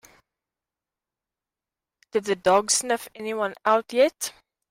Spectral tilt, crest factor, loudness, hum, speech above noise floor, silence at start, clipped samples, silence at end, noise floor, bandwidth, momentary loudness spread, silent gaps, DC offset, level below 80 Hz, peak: -2 dB/octave; 18 dB; -24 LUFS; none; 66 dB; 2.15 s; under 0.1%; 0.4 s; -90 dBFS; 16 kHz; 11 LU; none; under 0.1%; -68 dBFS; -8 dBFS